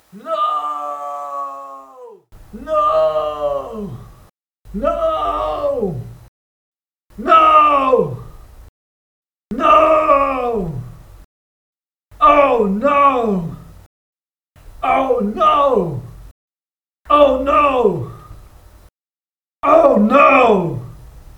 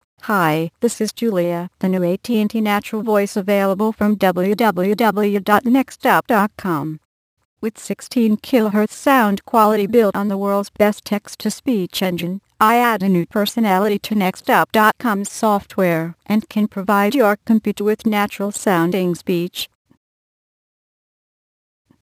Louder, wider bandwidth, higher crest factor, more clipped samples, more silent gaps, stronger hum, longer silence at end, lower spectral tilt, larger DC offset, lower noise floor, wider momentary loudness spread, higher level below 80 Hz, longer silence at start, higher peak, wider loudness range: first, -14 LUFS vs -18 LUFS; first, 18 kHz vs 15.5 kHz; about the same, 16 dB vs 18 dB; neither; first, 6.28-6.72 s, 8.69-9.23 s, 11.25-11.74 s, 13.86-14.13 s, 16.31-16.48 s vs 7.05-7.37 s, 7.45-7.57 s; neither; second, 0.2 s vs 2.4 s; first, -7 dB/octave vs -5.5 dB/octave; neither; about the same, under -90 dBFS vs under -90 dBFS; first, 18 LU vs 8 LU; first, -42 dBFS vs -60 dBFS; about the same, 0.15 s vs 0.25 s; about the same, 0 dBFS vs 0 dBFS; first, 7 LU vs 3 LU